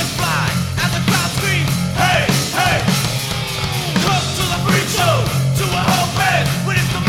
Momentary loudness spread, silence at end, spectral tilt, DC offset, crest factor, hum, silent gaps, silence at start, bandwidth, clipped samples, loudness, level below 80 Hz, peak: 4 LU; 0 s; -4 dB/octave; under 0.1%; 16 dB; none; none; 0 s; 17 kHz; under 0.1%; -16 LUFS; -36 dBFS; 0 dBFS